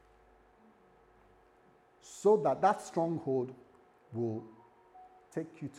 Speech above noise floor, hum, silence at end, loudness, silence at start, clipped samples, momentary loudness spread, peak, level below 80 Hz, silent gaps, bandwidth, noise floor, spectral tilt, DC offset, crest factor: 33 dB; none; 0 s; -33 LUFS; 2.05 s; under 0.1%; 17 LU; -14 dBFS; -76 dBFS; none; 12 kHz; -65 dBFS; -6.5 dB/octave; under 0.1%; 22 dB